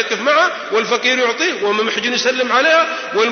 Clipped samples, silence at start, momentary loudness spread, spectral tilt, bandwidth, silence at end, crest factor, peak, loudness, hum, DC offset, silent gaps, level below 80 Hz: under 0.1%; 0 s; 5 LU; -1.5 dB/octave; 6.6 kHz; 0 s; 14 dB; -2 dBFS; -15 LUFS; none; under 0.1%; none; -68 dBFS